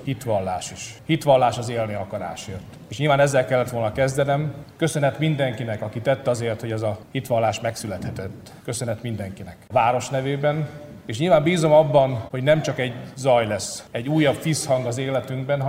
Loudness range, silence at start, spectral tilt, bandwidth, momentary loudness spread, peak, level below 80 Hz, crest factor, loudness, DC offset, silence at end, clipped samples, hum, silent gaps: 6 LU; 0 s; -5.5 dB/octave; 16 kHz; 14 LU; -4 dBFS; -54 dBFS; 18 dB; -22 LUFS; under 0.1%; 0 s; under 0.1%; none; none